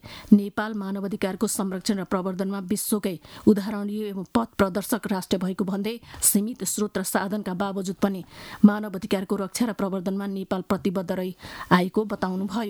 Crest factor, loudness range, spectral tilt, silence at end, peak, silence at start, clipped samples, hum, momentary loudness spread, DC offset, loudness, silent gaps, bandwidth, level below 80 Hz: 22 dB; 2 LU; -5 dB/octave; 0 s; -2 dBFS; 0.05 s; under 0.1%; none; 9 LU; under 0.1%; -25 LUFS; none; over 20 kHz; -56 dBFS